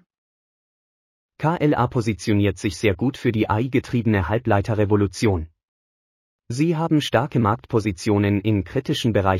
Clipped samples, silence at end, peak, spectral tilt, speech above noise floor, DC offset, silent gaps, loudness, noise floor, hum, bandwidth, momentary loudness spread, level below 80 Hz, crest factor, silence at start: under 0.1%; 0 s; -4 dBFS; -6.5 dB/octave; over 70 dB; under 0.1%; 5.68-6.39 s; -21 LUFS; under -90 dBFS; none; 14.5 kHz; 4 LU; -46 dBFS; 18 dB; 1.4 s